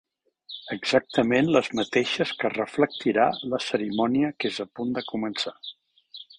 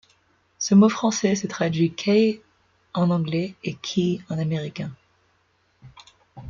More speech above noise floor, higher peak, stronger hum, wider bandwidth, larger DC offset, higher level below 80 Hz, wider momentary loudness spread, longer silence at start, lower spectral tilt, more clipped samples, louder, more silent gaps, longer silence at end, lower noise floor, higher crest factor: second, 24 dB vs 44 dB; about the same, -6 dBFS vs -6 dBFS; neither; first, 10.5 kHz vs 7.4 kHz; neither; about the same, -64 dBFS vs -62 dBFS; about the same, 14 LU vs 14 LU; about the same, 0.5 s vs 0.6 s; about the same, -5 dB/octave vs -5.5 dB/octave; neither; about the same, -25 LUFS vs -23 LUFS; neither; first, 0.15 s vs 0 s; second, -48 dBFS vs -66 dBFS; about the same, 20 dB vs 18 dB